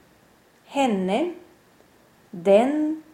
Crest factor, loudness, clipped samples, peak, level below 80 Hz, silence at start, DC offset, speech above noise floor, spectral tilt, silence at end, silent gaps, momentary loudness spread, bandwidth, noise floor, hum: 20 dB; -22 LUFS; under 0.1%; -6 dBFS; -68 dBFS; 0.7 s; under 0.1%; 36 dB; -6 dB/octave; 0.15 s; none; 16 LU; 15.5 kHz; -57 dBFS; none